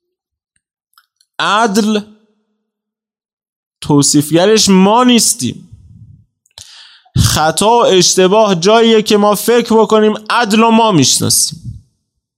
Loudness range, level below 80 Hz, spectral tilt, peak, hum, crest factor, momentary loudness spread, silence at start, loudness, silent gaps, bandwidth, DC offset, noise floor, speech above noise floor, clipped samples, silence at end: 9 LU; -40 dBFS; -4 dB/octave; 0 dBFS; none; 12 dB; 9 LU; 1.4 s; -10 LUFS; 3.33-3.37 s, 3.49-3.71 s; 16.5 kHz; under 0.1%; -82 dBFS; 73 dB; under 0.1%; 0.6 s